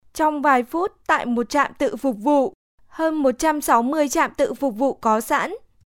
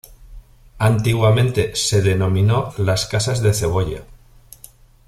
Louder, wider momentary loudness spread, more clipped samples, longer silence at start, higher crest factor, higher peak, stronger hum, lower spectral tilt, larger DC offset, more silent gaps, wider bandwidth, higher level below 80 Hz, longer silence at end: second, -21 LUFS vs -18 LUFS; about the same, 6 LU vs 5 LU; neither; about the same, 0.15 s vs 0.1 s; about the same, 16 dB vs 16 dB; about the same, -4 dBFS vs -2 dBFS; neither; second, -3.5 dB/octave vs -5 dB/octave; neither; first, 2.55-2.78 s vs none; first, 17 kHz vs 14.5 kHz; second, -52 dBFS vs -40 dBFS; second, 0.3 s vs 1.05 s